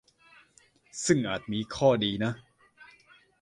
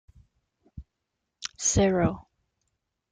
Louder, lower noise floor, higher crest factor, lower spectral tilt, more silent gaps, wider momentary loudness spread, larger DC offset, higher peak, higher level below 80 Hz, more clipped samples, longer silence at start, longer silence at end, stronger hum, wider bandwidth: second, -28 LUFS vs -25 LUFS; second, -63 dBFS vs -83 dBFS; about the same, 22 dB vs 20 dB; about the same, -4.5 dB/octave vs -4.5 dB/octave; neither; second, 12 LU vs 17 LU; neither; about the same, -10 dBFS vs -10 dBFS; second, -60 dBFS vs -48 dBFS; neither; first, 0.95 s vs 0.75 s; about the same, 1 s vs 0.9 s; neither; first, 11.5 kHz vs 10 kHz